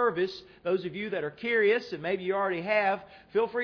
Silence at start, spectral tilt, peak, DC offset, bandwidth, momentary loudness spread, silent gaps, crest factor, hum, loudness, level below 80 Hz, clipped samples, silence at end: 0 s; -6.5 dB/octave; -14 dBFS; under 0.1%; 5.4 kHz; 8 LU; none; 14 dB; none; -29 LUFS; -68 dBFS; under 0.1%; 0 s